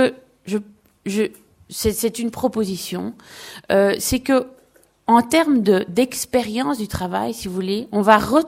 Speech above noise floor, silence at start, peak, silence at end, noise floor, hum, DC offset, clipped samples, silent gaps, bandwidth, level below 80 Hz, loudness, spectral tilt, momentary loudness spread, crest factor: 36 dB; 0 s; 0 dBFS; 0 s; -55 dBFS; none; under 0.1%; under 0.1%; none; 16.5 kHz; -46 dBFS; -20 LUFS; -4.5 dB/octave; 15 LU; 20 dB